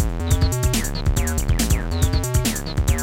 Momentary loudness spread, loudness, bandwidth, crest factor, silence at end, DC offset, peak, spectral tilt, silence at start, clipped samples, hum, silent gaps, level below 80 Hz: 3 LU; -21 LUFS; 17 kHz; 16 dB; 0 s; under 0.1%; -4 dBFS; -4.5 dB/octave; 0 s; under 0.1%; none; none; -24 dBFS